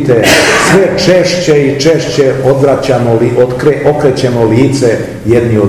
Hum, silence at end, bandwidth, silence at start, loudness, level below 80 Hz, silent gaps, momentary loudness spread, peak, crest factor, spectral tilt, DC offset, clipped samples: none; 0 s; 18 kHz; 0 s; -8 LUFS; -36 dBFS; none; 4 LU; 0 dBFS; 8 dB; -5 dB/octave; 0.7%; 3%